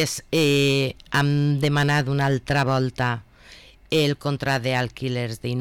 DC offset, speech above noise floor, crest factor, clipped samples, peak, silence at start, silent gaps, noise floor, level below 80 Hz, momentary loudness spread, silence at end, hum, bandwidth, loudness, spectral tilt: under 0.1%; 26 dB; 10 dB; under 0.1%; -12 dBFS; 0 s; none; -48 dBFS; -50 dBFS; 7 LU; 0 s; none; 16.5 kHz; -22 LUFS; -5.5 dB/octave